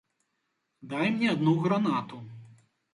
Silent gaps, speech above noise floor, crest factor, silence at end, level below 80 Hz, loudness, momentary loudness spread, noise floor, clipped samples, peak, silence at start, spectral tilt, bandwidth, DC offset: none; 52 dB; 18 dB; 0.5 s; -72 dBFS; -27 LUFS; 18 LU; -79 dBFS; under 0.1%; -12 dBFS; 0.85 s; -7.5 dB/octave; 11 kHz; under 0.1%